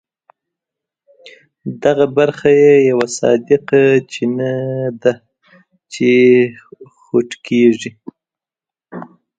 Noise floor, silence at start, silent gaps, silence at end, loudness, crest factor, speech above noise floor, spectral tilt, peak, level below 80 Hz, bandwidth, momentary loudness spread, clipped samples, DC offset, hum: -89 dBFS; 1.25 s; none; 0.35 s; -14 LUFS; 16 dB; 76 dB; -6 dB/octave; 0 dBFS; -58 dBFS; 9.2 kHz; 21 LU; under 0.1%; under 0.1%; none